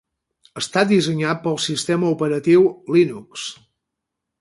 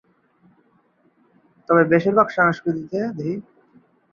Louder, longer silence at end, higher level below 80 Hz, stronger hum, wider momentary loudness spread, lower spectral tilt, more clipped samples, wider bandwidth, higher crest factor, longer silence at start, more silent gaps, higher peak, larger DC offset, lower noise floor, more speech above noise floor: about the same, -19 LUFS vs -19 LUFS; first, 0.9 s vs 0.7 s; about the same, -62 dBFS vs -62 dBFS; neither; first, 15 LU vs 12 LU; second, -5 dB/octave vs -8.5 dB/octave; neither; first, 11.5 kHz vs 7 kHz; about the same, 16 dB vs 20 dB; second, 0.55 s vs 1.7 s; neither; about the same, -4 dBFS vs -2 dBFS; neither; first, -81 dBFS vs -61 dBFS; first, 62 dB vs 42 dB